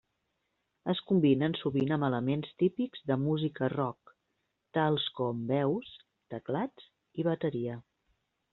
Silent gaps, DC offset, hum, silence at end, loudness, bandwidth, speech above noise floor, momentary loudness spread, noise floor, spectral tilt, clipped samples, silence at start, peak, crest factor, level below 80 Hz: none; under 0.1%; none; 0.7 s; -31 LUFS; 4.3 kHz; 50 dB; 12 LU; -81 dBFS; -6 dB/octave; under 0.1%; 0.85 s; -14 dBFS; 18 dB; -72 dBFS